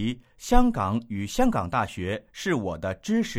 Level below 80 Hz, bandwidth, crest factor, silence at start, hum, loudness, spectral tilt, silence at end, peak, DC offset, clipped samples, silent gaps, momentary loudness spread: -34 dBFS; 15 kHz; 20 dB; 0 s; none; -27 LUFS; -5.5 dB/octave; 0 s; -4 dBFS; under 0.1%; under 0.1%; none; 9 LU